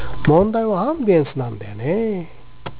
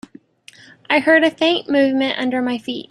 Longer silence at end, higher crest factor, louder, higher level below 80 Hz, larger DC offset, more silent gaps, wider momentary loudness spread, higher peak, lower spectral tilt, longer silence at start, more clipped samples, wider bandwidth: about the same, 0 s vs 0.1 s; about the same, 16 dB vs 16 dB; about the same, -19 LUFS vs -17 LUFS; first, -40 dBFS vs -64 dBFS; neither; neither; first, 13 LU vs 8 LU; about the same, -4 dBFS vs -2 dBFS; first, -12 dB/octave vs -4.5 dB/octave; second, 0 s vs 0.9 s; neither; second, 4 kHz vs 11.5 kHz